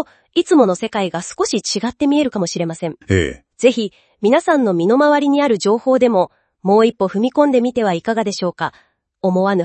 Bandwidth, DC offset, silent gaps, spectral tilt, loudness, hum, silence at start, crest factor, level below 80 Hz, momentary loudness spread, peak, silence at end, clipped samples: 8.8 kHz; under 0.1%; none; -5.5 dB/octave; -16 LUFS; none; 0 s; 16 dB; -50 dBFS; 9 LU; 0 dBFS; 0 s; under 0.1%